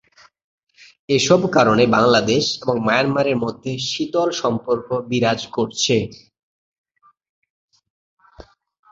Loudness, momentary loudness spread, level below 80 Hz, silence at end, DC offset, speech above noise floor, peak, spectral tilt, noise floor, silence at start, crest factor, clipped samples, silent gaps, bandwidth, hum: -18 LUFS; 8 LU; -54 dBFS; 0.5 s; under 0.1%; 28 dB; -2 dBFS; -4.5 dB/octave; -46 dBFS; 1.1 s; 18 dB; under 0.1%; 6.43-6.72 s, 6.78-6.84 s, 7.30-7.42 s, 7.50-7.68 s, 7.90-8.17 s; 8 kHz; none